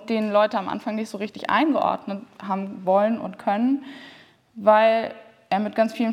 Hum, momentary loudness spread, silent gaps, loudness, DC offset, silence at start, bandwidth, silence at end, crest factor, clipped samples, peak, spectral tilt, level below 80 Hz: none; 12 LU; none; -23 LUFS; under 0.1%; 0 s; 12 kHz; 0 s; 20 dB; under 0.1%; -4 dBFS; -6.5 dB/octave; -74 dBFS